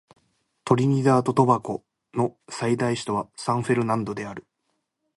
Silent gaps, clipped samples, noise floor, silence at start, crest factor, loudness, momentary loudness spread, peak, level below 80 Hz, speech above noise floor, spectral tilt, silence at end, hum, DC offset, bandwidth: none; under 0.1%; -76 dBFS; 0.65 s; 20 dB; -24 LUFS; 14 LU; -4 dBFS; -62 dBFS; 53 dB; -6.5 dB/octave; 0.75 s; none; under 0.1%; 11.5 kHz